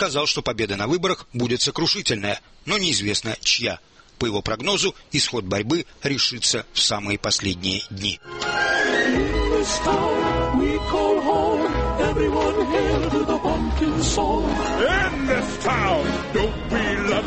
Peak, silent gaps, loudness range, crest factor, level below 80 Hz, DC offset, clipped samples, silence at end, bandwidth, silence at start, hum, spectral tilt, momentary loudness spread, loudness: -6 dBFS; none; 1 LU; 16 dB; -34 dBFS; under 0.1%; under 0.1%; 0 s; 8.8 kHz; 0 s; none; -3.5 dB/octave; 5 LU; -21 LUFS